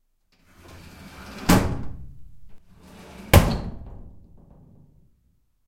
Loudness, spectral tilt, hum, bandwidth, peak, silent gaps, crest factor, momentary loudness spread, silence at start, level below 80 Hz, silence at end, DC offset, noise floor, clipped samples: -21 LUFS; -5.5 dB/octave; none; 16.5 kHz; 0 dBFS; none; 26 dB; 28 LU; 0.75 s; -34 dBFS; 1.5 s; under 0.1%; -65 dBFS; under 0.1%